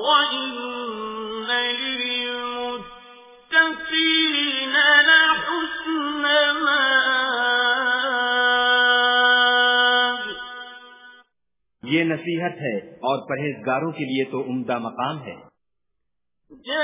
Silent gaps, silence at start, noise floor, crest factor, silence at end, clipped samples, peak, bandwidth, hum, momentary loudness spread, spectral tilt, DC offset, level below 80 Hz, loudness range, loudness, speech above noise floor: none; 0 s; -82 dBFS; 18 dB; 0 s; under 0.1%; -4 dBFS; 3.9 kHz; none; 14 LU; -7 dB/octave; under 0.1%; -64 dBFS; 10 LU; -19 LUFS; 58 dB